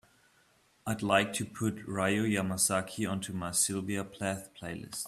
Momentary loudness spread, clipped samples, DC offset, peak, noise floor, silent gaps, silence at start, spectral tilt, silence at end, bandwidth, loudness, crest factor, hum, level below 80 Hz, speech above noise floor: 11 LU; under 0.1%; under 0.1%; -12 dBFS; -67 dBFS; none; 0.85 s; -3.5 dB/octave; 0 s; 15.5 kHz; -31 LUFS; 22 dB; none; -66 dBFS; 35 dB